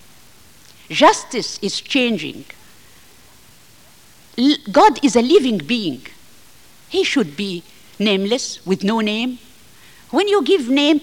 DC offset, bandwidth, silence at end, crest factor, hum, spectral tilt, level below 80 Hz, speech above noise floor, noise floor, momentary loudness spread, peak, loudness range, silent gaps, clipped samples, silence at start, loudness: 0.3%; 17 kHz; 0 s; 18 dB; none; -4 dB/octave; -56 dBFS; 32 dB; -48 dBFS; 13 LU; 0 dBFS; 4 LU; none; under 0.1%; 0.9 s; -17 LUFS